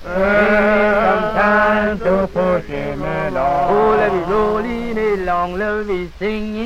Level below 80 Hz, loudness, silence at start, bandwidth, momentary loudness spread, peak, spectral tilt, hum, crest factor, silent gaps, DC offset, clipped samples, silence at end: -34 dBFS; -16 LUFS; 0 s; 13 kHz; 9 LU; -2 dBFS; -7 dB/octave; none; 14 dB; none; under 0.1%; under 0.1%; 0 s